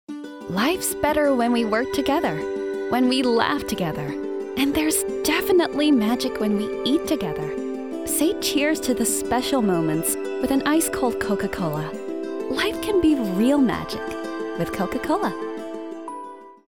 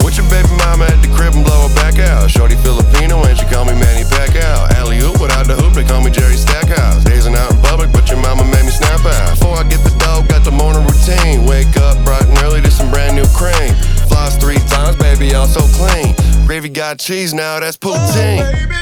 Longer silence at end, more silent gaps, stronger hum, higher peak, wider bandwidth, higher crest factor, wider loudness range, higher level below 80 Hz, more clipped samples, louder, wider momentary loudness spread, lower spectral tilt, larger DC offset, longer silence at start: first, 0.15 s vs 0 s; neither; neither; second, -6 dBFS vs 0 dBFS; about the same, over 20 kHz vs 19 kHz; first, 18 dB vs 8 dB; about the same, 2 LU vs 1 LU; second, -50 dBFS vs -10 dBFS; neither; second, -22 LUFS vs -11 LUFS; first, 10 LU vs 3 LU; about the same, -4 dB/octave vs -5 dB/octave; first, 0.3% vs under 0.1%; about the same, 0.1 s vs 0 s